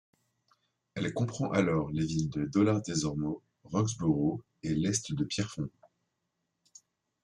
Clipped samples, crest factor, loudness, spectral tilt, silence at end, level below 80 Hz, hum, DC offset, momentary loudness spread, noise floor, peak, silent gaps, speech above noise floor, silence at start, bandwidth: under 0.1%; 18 dB; -32 LUFS; -5.5 dB/octave; 1.55 s; -60 dBFS; none; under 0.1%; 9 LU; -82 dBFS; -14 dBFS; none; 52 dB; 0.95 s; 11 kHz